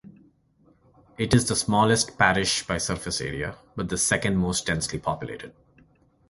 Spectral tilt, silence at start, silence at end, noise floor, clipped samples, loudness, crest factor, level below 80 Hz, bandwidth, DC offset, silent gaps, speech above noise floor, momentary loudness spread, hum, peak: -3.5 dB/octave; 0.05 s; 0.8 s; -61 dBFS; under 0.1%; -24 LUFS; 24 dB; -46 dBFS; 12 kHz; under 0.1%; none; 37 dB; 13 LU; none; -4 dBFS